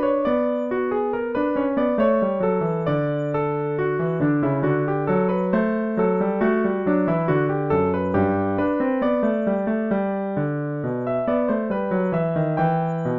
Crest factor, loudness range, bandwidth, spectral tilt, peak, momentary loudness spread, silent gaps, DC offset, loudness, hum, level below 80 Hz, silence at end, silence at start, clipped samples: 14 dB; 2 LU; 5.2 kHz; -10.5 dB/octave; -8 dBFS; 3 LU; none; 0.2%; -22 LUFS; none; -54 dBFS; 0 s; 0 s; under 0.1%